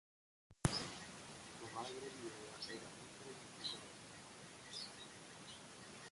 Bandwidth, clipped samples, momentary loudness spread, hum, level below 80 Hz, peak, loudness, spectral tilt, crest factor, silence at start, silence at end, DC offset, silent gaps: 11.5 kHz; under 0.1%; 13 LU; none; -68 dBFS; -16 dBFS; -49 LUFS; -3.5 dB/octave; 34 dB; 0.5 s; 0 s; under 0.1%; none